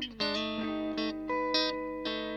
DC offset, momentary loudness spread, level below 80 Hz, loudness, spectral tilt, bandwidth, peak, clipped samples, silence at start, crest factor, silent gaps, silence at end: under 0.1%; 6 LU; -58 dBFS; -32 LUFS; -4.5 dB/octave; 9.4 kHz; -14 dBFS; under 0.1%; 0 s; 18 dB; none; 0 s